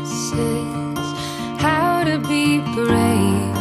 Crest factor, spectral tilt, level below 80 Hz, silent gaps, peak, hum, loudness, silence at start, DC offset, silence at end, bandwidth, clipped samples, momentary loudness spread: 16 dB; -5 dB/octave; -46 dBFS; none; -4 dBFS; none; -19 LUFS; 0 s; under 0.1%; 0 s; 14.5 kHz; under 0.1%; 8 LU